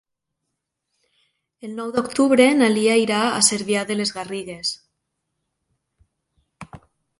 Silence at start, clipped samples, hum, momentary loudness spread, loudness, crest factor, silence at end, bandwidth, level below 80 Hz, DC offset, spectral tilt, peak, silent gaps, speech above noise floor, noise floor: 1.65 s; under 0.1%; none; 16 LU; -19 LUFS; 20 dB; 0.45 s; 11.5 kHz; -62 dBFS; under 0.1%; -3 dB/octave; -2 dBFS; none; 60 dB; -79 dBFS